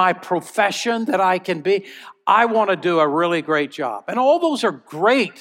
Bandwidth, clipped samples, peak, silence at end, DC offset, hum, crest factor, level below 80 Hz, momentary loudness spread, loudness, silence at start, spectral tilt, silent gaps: 16.5 kHz; under 0.1%; -2 dBFS; 0.1 s; under 0.1%; none; 18 dB; -78 dBFS; 7 LU; -19 LUFS; 0 s; -4.5 dB/octave; none